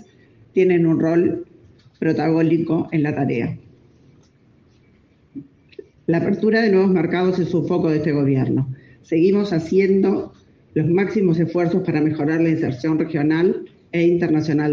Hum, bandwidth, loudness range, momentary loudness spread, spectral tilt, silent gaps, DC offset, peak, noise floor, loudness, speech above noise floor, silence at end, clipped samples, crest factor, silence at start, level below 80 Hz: none; 6.8 kHz; 6 LU; 10 LU; -9 dB/octave; none; under 0.1%; -6 dBFS; -55 dBFS; -19 LUFS; 37 dB; 0 s; under 0.1%; 14 dB; 0.55 s; -58 dBFS